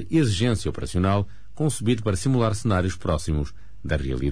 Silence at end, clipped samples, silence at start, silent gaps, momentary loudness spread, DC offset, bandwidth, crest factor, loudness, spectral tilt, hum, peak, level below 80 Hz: 0 s; under 0.1%; 0 s; none; 7 LU; 2%; 11 kHz; 14 dB; -24 LUFS; -6 dB/octave; none; -10 dBFS; -36 dBFS